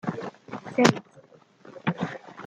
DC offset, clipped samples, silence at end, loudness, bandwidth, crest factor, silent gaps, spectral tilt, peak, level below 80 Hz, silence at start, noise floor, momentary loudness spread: under 0.1%; under 0.1%; 0 s; -26 LUFS; 10 kHz; 26 dB; none; -5 dB/octave; -2 dBFS; -66 dBFS; 0.05 s; -55 dBFS; 17 LU